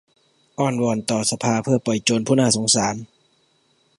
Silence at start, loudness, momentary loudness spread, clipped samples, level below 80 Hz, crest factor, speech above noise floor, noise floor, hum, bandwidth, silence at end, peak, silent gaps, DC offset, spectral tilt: 0.6 s; -20 LUFS; 8 LU; under 0.1%; -60 dBFS; 20 dB; 43 dB; -63 dBFS; none; 11.5 kHz; 0.95 s; -2 dBFS; none; under 0.1%; -4 dB/octave